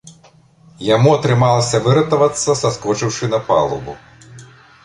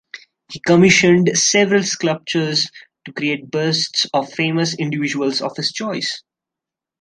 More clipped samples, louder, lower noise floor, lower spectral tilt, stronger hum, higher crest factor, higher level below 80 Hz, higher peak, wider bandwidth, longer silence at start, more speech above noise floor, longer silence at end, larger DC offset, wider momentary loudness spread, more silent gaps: neither; about the same, -15 LUFS vs -17 LUFS; second, -49 dBFS vs -86 dBFS; first, -5.5 dB/octave vs -3.5 dB/octave; neither; about the same, 16 dB vs 18 dB; first, -48 dBFS vs -56 dBFS; about the same, -2 dBFS vs 0 dBFS; about the same, 11 kHz vs 10.5 kHz; about the same, 0.05 s vs 0.15 s; second, 34 dB vs 69 dB; second, 0.4 s vs 0.8 s; neither; about the same, 11 LU vs 12 LU; neither